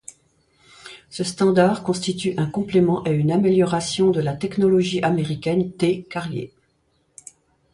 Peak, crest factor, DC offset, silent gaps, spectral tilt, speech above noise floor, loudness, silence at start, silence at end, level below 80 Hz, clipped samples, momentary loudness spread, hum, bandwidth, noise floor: -4 dBFS; 18 dB; under 0.1%; none; -6 dB/octave; 46 dB; -21 LUFS; 0.85 s; 1.25 s; -56 dBFS; under 0.1%; 11 LU; none; 11.5 kHz; -66 dBFS